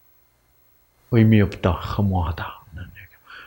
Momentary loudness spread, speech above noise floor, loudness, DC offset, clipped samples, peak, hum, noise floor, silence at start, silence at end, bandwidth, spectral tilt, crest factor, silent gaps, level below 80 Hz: 23 LU; 40 dB; -20 LUFS; under 0.1%; under 0.1%; -2 dBFS; none; -60 dBFS; 1.1 s; 0 s; 16.5 kHz; -9 dB/octave; 20 dB; none; -42 dBFS